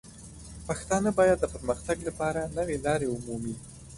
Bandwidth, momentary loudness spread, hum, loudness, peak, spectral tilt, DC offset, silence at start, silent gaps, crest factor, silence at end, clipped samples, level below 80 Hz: 11.5 kHz; 19 LU; none; -29 LUFS; -12 dBFS; -5.5 dB/octave; under 0.1%; 0.05 s; none; 18 dB; 0 s; under 0.1%; -48 dBFS